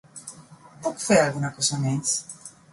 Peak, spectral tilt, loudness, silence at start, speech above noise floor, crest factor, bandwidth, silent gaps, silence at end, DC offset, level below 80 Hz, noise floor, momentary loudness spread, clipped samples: -6 dBFS; -4 dB/octave; -24 LUFS; 0.15 s; 24 dB; 20 dB; 11.5 kHz; none; 0.25 s; under 0.1%; -60 dBFS; -48 dBFS; 20 LU; under 0.1%